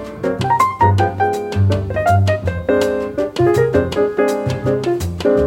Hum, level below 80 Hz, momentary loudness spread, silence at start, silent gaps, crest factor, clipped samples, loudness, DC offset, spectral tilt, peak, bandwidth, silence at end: none; -40 dBFS; 5 LU; 0 s; none; 14 dB; under 0.1%; -17 LUFS; under 0.1%; -7 dB/octave; -2 dBFS; 17 kHz; 0 s